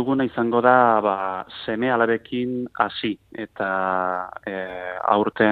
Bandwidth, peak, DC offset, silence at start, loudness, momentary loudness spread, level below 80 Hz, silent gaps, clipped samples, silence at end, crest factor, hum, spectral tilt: 4.7 kHz; -2 dBFS; under 0.1%; 0 s; -22 LUFS; 14 LU; -60 dBFS; none; under 0.1%; 0 s; 20 dB; none; -8 dB/octave